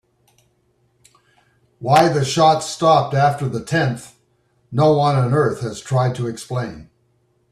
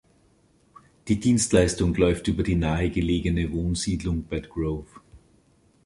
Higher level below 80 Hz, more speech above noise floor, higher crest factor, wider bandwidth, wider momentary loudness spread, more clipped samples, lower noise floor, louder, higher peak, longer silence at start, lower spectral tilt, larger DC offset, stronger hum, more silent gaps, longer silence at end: second, -54 dBFS vs -36 dBFS; first, 46 dB vs 38 dB; about the same, 18 dB vs 20 dB; first, 13.5 kHz vs 11.5 kHz; first, 12 LU vs 9 LU; neither; about the same, -63 dBFS vs -61 dBFS; first, -18 LUFS vs -24 LUFS; first, -2 dBFS vs -6 dBFS; first, 1.8 s vs 1.05 s; about the same, -6 dB/octave vs -5.5 dB/octave; neither; neither; neither; about the same, 0.7 s vs 0.7 s